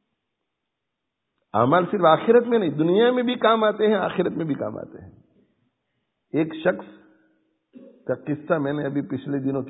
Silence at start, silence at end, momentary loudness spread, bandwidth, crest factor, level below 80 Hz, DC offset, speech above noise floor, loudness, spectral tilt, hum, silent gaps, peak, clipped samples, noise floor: 1.55 s; 0 s; 12 LU; 4 kHz; 22 dB; -66 dBFS; under 0.1%; 60 dB; -22 LUFS; -11 dB/octave; none; none; -2 dBFS; under 0.1%; -81 dBFS